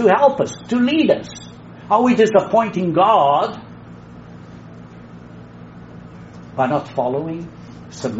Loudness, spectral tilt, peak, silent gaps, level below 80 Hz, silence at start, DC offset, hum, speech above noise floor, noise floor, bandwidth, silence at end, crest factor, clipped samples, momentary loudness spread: -17 LUFS; -5 dB/octave; -2 dBFS; none; -54 dBFS; 0 s; under 0.1%; none; 22 dB; -38 dBFS; 8 kHz; 0 s; 18 dB; under 0.1%; 25 LU